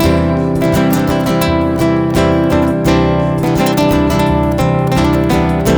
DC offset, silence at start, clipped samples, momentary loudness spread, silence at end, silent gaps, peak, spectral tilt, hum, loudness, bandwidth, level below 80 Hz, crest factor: under 0.1%; 0 s; under 0.1%; 2 LU; 0 s; none; 0 dBFS; -6.5 dB/octave; none; -13 LUFS; over 20 kHz; -24 dBFS; 10 dB